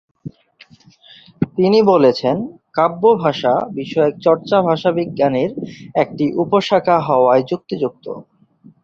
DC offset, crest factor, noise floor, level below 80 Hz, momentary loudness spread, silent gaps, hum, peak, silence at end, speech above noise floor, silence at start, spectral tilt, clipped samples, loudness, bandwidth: under 0.1%; 16 dB; -48 dBFS; -58 dBFS; 11 LU; none; none; 0 dBFS; 0.6 s; 33 dB; 0.25 s; -7.5 dB/octave; under 0.1%; -16 LUFS; 7.4 kHz